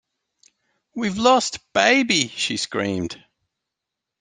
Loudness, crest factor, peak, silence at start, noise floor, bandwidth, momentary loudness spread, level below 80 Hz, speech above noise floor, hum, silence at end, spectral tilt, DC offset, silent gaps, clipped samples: -20 LUFS; 22 dB; -2 dBFS; 0.95 s; -84 dBFS; 10 kHz; 14 LU; -60 dBFS; 63 dB; none; 1.05 s; -3 dB/octave; under 0.1%; none; under 0.1%